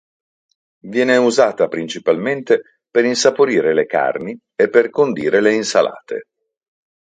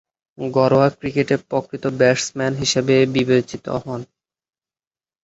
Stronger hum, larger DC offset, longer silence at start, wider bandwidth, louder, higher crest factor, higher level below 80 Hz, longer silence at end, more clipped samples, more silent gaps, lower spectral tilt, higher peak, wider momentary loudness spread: neither; neither; first, 0.85 s vs 0.4 s; first, 9.4 kHz vs 8 kHz; first, -16 LUFS vs -19 LUFS; about the same, 18 dB vs 18 dB; second, -64 dBFS vs -54 dBFS; second, 0.95 s vs 1.2 s; neither; neither; about the same, -4 dB/octave vs -5 dB/octave; about the same, 0 dBFS vs -2 dBFS; about the same, 9 LU vs 11 LU